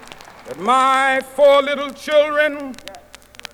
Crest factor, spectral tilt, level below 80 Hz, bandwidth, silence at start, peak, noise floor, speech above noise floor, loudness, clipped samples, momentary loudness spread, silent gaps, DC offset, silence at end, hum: 14 dB; -2.5 dB/octave; -56 dBFS; 13.5 kHz; 0.05 s; -4 dBFS; -42 dBFS; 26 dB; -16 LUFS; under 0.1%; 22 LU; none; under 0.1%; 0.55 s; none